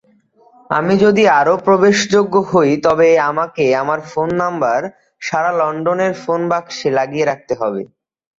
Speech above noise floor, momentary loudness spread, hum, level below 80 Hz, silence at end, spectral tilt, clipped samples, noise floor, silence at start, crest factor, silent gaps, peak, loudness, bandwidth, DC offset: 37 dB; 9 LU; none; -56 dBFS; 0.5 s; -5 dB/octave; under 0.1%; -52 dBFS; 0.7 s; 14 dB; none; -2 dBFS; -15 LUFS; 7.8 kHz; under 0.1%